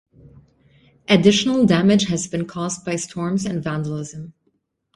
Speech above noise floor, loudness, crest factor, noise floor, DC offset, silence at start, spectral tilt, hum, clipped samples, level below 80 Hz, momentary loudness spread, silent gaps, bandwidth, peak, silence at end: 49 dB; -19 LUFS; 20 dB; -68 dBFS; under 0.1%; 1.1 s; -5 dB/octave; none; under 0.1%; -54 dBFS; 17 LU; none; 11.5 kHz; -2 dBFS; 0.65 s